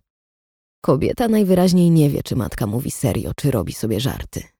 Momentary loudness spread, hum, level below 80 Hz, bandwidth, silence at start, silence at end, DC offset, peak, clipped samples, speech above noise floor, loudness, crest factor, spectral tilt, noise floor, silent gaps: 9 LU; none; -40 dBFS; 18 kHz; 0.85 s; 0.15 s; under 0.1%; -4 dBFS; under 0.1%; over 72 dB; -19 LUFS; 16 dB; -6.5 dB/octave; under -90 dBFS; none